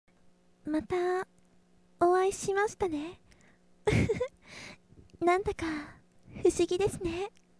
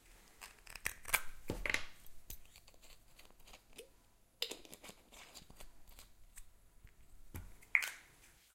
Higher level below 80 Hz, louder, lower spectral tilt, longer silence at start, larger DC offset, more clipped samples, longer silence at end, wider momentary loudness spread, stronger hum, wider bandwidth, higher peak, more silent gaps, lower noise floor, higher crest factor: first, -52 dBFS vs -58 dBFS; first, -31 LUFS vs -39 LUFS; first, -5.5 dB/octave vs -1.5 dB/octave; first, 0.65 s vs 0 s; neither; neither; first, 0.3 s vs 0.05 s; second, 18 LU vs 26 LU; neither; second, 11 kHz vs 16.5 kHz; about the same, -12 dBFS vs -12 dBFS; neither; about the same, -65 dBFS vs -68 dBFS; second, 20 dB vs 34 dB